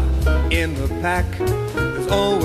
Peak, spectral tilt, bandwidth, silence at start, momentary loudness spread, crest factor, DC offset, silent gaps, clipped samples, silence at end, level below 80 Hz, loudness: -4 dBFS; -6 dB/octave; 14 kHz; 0 s; 4 LU; 14 dB; under 0.1%; none; under 0.1%; 0 s; -24 dBFS; -21 LUFS